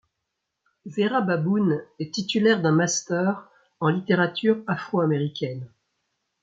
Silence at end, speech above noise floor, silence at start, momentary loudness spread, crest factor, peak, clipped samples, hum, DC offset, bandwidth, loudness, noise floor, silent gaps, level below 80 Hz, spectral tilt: 0.75 s; 58 dB; 0.85 s; 11 LU; 18 dB; -8 dBFS; under 0.1%; none; under 0.1%; 9 kHz; -24 LUFS; -81 dBFS; none; -70 dBFS; -5 dB/octave